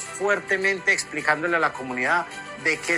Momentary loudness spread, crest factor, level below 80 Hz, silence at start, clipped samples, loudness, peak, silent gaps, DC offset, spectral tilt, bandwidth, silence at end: 5 LU; 20 dB; -64 dBFS; 0 s; under 0.1%; -23 LUFS; -4 dBFS; none; under 0.1%; -2.5 dB/octave; 15.5 kHz; 0 s